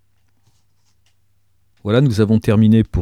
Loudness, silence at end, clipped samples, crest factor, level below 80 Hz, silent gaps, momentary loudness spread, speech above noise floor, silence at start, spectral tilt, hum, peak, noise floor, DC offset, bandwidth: -15 LUFS; 0 s; under 0.1%; 16 dB; -42 dBFS; none; 6 LU; 51 dB; 1.85 s; -8.5 dB/octave; none; -2 dBFS; -65 dBFS; 0.1%; 12 kHz